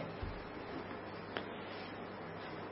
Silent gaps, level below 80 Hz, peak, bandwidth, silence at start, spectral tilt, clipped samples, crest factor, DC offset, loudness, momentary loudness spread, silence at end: none; -58 dBFS; -18 dBFS; 5.6 kHz; 0 s; -4 dB/octave; under 0.1%; 26 dB; under 0.1%; -46 LUFS; 3 LU; 0 s